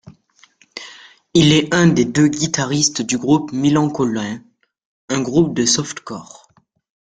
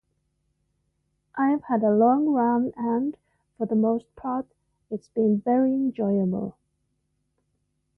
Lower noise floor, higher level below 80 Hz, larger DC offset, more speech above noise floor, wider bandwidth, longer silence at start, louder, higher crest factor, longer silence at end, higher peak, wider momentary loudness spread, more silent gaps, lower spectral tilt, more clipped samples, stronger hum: second, -57 dBFS vs -75 dBFS; first, -52 dBFS vs -66 dBFS; neither; second, 41 dB vs 51 dB; first, 9.4 kHz vs 3.2 kHz; second, 0.05 s vs 1.35 s; first, -16 LUFS vs -24 LUFS; about the same, 18 dB vs 16 dB; second, 0.95 s vs 1.45 s; first, 0 dBFS vs -10 dBFS; first, 20 LU vs 13 LU; first, 4.85-5.08 s vs none; second, -4.5 dB/octave vs -11 dB/octave; neither; neither